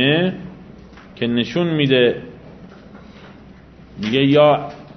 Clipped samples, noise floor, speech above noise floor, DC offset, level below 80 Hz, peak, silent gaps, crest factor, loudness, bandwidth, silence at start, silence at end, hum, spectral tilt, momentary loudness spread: under 0.1%; -42 dBFS; 26 dB; under 0.1%; -50 dBFS; -2 dBFS; none; 18 dB; -17 LUFS; 6.4 kHz; 0 s; 0.05 s; none; -7 dB/octave; 18 LU